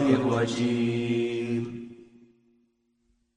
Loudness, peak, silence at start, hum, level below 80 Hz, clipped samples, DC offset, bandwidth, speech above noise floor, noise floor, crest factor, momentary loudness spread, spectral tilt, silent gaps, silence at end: -27 LUFS; -8 dBFS; 0 s; none; -64 dBFS; under 0.1%; under 0.1%; 10 kHz; 46 dB; -71 dBFS; 20 dB; 14 LU; -6.5 dB/octave; none; 1.3 s